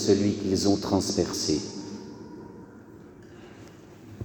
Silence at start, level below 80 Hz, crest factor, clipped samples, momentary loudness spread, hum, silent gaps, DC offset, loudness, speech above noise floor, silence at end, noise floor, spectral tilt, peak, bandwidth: 0 s; -56 dBFS; 20 dB; under 0.1%; 24 LU; none; none; under 0.1%; -26 LUFS; 23 dB; 0 s; -47 dBFS; -5 dB/octave; -10 dBFS; over 20 kHz